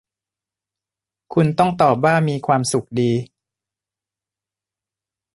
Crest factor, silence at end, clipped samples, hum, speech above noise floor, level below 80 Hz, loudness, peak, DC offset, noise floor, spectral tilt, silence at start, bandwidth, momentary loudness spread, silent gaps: 18 dB; 2.1 s; under 0.1%; none; 72 dB; -58 dBFS; -18 LUFS; -2 dBFS; under 0.1%; -89 dBFS; -6 dB/octave; 1.3 s; 11.5 kHz; 6 LU; none